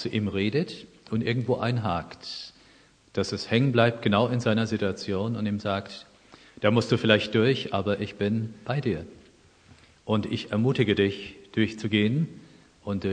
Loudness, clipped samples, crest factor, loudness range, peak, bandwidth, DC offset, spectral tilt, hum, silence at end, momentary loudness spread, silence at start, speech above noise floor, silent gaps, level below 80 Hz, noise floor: -26 LUFS; under 0.1%; 24 dB; 4 LU; -4 dBFS; 9.6 kHz; under 0.1%; -6.5 dB/octave; none; 0 s; 14 LU; 0 s; 32 dB; none; -60 dBFS; -58 dBFS